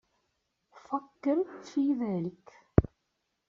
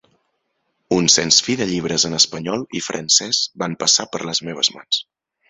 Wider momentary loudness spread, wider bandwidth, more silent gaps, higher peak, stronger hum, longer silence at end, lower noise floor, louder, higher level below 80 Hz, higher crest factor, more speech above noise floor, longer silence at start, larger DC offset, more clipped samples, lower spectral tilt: about the same, 9 LU vs 10 LU; second, 7.4 kHz vs 8.4 kHz; neither; second, -4 dBFS vs 0 dBFS; neither; first, 0.65 s vs 0.45 s; first, -81 dBFS vs -71 dBFS; second, -31 LUFS vs -17 LUFS; first, -46 dBFS vs -56 dBFS; first, 28 dB vs 20 dB; about the same, 50 dB vs 52 dB; second, 0.75 s vs 0.9 s; neither; neither; first, -9 dB/octave vs -2 dB/octave